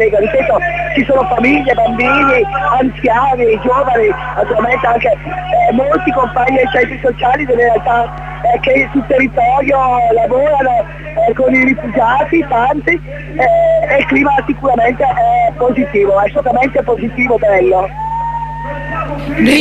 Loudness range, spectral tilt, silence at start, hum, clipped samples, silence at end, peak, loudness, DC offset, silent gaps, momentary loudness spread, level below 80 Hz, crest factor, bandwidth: 1 LU; -6.5 dB/octave; 0 s; none; under 0.1%; 0 s; 0 dBFS; -12 LUFS; under 0.1%; none; 6 LU; -32 dBFS; 12 dB; 12.5 kHz